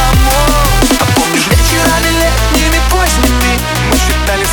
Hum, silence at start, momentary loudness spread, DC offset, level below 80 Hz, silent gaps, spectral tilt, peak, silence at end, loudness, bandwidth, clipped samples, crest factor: none; 0 s; 2 LU; under 0.1%; -14 dBFS; none; -3.5 dB/octave; 0 dBFS; 0 s; -10 LUFS; over 20 kHz; under 0.1%; 10 dB